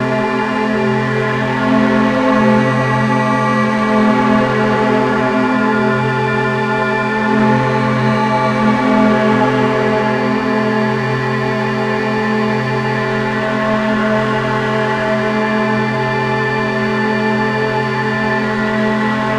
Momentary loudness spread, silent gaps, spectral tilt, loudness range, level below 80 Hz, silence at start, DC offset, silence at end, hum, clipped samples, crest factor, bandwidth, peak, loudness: 4 LU; none; -7 dB/octave; 3 LU; -44 dBFS; 0 s; under 0.1%; 0 s; none; under 0.1%; 14 dB; 10.5 kHz; 0 dBFS; -14 LUFS